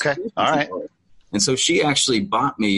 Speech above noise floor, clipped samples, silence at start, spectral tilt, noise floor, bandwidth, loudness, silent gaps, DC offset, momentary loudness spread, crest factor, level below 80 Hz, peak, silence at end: 21 dB; under 0.1%; 0 s; -3 dB/octave; -40 dBFS; 11.5 kHz; -19 LUFS; none; under 0.1%; 12 LU; 16 dB; -56 dBFS; -4 dBFS; 0 s